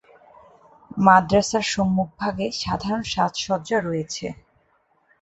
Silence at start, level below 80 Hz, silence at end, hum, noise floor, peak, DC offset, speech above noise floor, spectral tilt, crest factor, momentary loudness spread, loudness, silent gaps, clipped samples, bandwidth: 0.9 s; -50 dBFS; 0.9 s; none; -64 dBFS; -2 dBFS; under 0.1%; 43 dB; -4.5 dB/octave; 22 dB; 13 LU; -22 LUFS; none; under 0.1%; 8.2 kHz